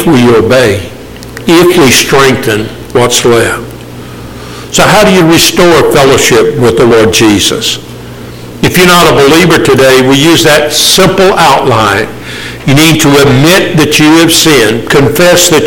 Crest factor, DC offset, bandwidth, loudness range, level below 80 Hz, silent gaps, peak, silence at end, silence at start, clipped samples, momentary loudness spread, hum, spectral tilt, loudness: 6 dB; under 0.1%; over 20 kHz; 3 LU; -30 dBFS; none; 0 dBFS; 0 s; 0 s; 0.9%; 19 LU; none; -4 dB/octave; -4 LUFS